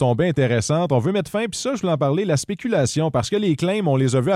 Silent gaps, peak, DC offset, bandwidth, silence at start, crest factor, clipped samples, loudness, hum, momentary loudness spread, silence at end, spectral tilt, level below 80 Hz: none; -6 dBFS; under 0.1%; 13.5 kHz; 0 s; 12 dB; under 0.1%; -20 LUFS; none; 4 LU; 0 s; -6 dB/octave; -52 dBFS